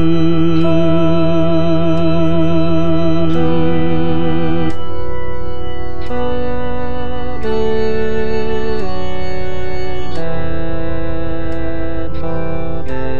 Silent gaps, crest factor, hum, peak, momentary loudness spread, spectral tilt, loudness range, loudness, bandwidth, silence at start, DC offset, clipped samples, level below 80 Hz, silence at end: none; 14 dB; none; -2 dBFS; 10 LU; -8.5 dB/octave; 8 LU; -18 LUFS; 7 kHz; 0 s; 30%; under 0.1%; -30 dBFS; 0 s